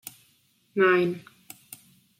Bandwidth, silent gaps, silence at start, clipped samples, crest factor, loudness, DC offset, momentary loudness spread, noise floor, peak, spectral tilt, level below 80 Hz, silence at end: 16.5 kHz; none; 0.75 s; under 0.1%; 20 dB; -24 LUFS; under 0.1%; 25 LU; -65 dBFS; -10 dBFS; -5.5 dB/octave; -76 dBFS; 1 s